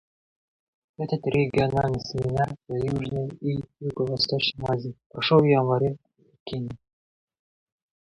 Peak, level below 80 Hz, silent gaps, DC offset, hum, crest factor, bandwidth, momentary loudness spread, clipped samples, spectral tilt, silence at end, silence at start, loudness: -6 dBFS; -52 dBFS; 5.06-5.10 s, 6.40-6.46 s; under 0.1%; none; 20 dB; 10.5 kHz; 15 LU; under 0.1%; -7 dB/octave; 1.25 s; 1 s; -25 LUFS